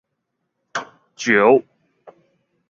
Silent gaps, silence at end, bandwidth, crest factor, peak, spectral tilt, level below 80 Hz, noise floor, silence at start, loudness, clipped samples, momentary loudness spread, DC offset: none; 0.6 s; 7.4 kHz; 20 dB; -2 dBFS; -4.5 dB/octave; -66 dBFS; -76 dBFS; 0.75 s; -18 LUFS; under 0.1%; 16 LU; under 0.1%